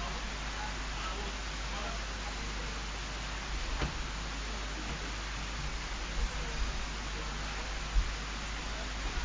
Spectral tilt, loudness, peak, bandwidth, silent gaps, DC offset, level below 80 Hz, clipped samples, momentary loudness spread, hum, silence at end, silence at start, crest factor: -3 dB/octave; -38 LUFS; -18 dBFS; 7.6 kHz; none; under 0.1%; -38 dBFS; under 0.1%; 2 LU; none; 0 s; 0 s; 18 dB